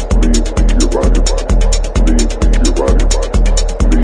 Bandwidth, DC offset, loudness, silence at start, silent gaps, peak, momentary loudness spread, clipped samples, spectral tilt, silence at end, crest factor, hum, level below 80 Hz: 10.5 kHz; under 0.1%; -14 LUFS; 0 s; none; 0 dBFS; 2 LU; under 0.1%; -5 dB/octave; 0 s; 10 dB; none; -10 dBFS